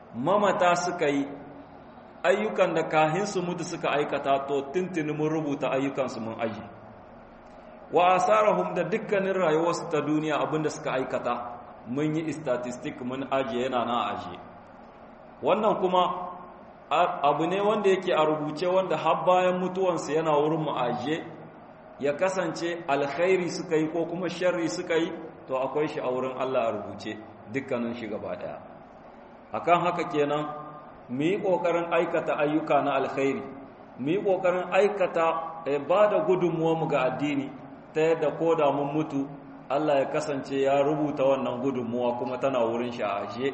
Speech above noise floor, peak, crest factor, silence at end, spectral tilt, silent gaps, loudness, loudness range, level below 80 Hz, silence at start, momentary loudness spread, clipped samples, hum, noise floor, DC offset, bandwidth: 22 dB; -8 dBFS; 20 dB; 0 s; -5.5 dB/octave; none; -27 LUFS; 5 LU; -66 dBFS; 0 s; 12 LU; under 0.1%; none; -48 dBFS; under 0.1%; 8.4 kHz